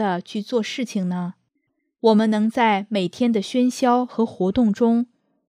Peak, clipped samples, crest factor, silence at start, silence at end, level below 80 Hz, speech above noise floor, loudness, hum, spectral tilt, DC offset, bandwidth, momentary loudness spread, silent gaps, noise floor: -6 dBFS; under 0.1%; 16 dB; 0 s; 0.5 s; -58 dBFS; 53 dB; -21 LUFS; none; -6 dB/octave; under 0.1%; 11.5 kHz; 8 LU; none; -73 dBFS